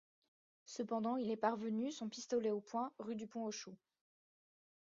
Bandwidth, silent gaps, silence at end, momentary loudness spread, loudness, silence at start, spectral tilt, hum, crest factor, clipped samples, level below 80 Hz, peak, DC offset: 7.4 kHz; none; 1.1 s; 9 LU; -42 LUFS; 0.7 s; -4.5 dB/octave; none; 22 dB; under 0.1%; -88 dBFS; -22 dBFS; under 0.1%